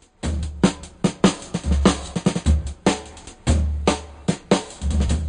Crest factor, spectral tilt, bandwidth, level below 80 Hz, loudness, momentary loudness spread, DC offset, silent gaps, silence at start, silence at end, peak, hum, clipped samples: 16 dB; -5.5 dB/octave; 10 kHz; -26 dBFS; -22 LUFS; 8 LU; under 0.1%; none; 0.25 s; 0 s; -6 dBFS; none; under 0.1%